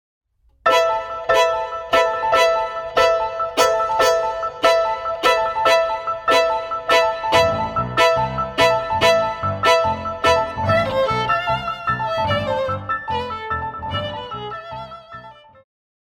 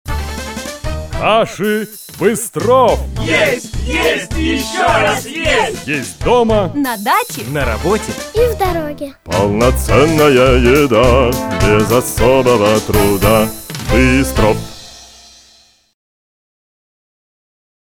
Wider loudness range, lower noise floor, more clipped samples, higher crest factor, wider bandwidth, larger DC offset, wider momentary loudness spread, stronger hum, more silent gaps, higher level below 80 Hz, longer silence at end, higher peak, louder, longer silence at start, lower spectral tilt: about the same, 6 LU vs 5 LU; second, -41 dBFS vs -49 dBFS; neither; about the same, 18 dB vs 14 dB; about the same, 18 kHz vs 19.5 kHz; neither; second, 9 LU vs 12 LU; neither; neither; second, -44 dBFS vs -26 dBFS; second, 0.8 s vs 2.85 s; about the same, 0 dBFS vs 0 dBFS; second, -18 LUFS vs -13 LUFS; first, 0.65 s vs 0.05 s; second, -3.5 dB/octave vs -5 dB/octave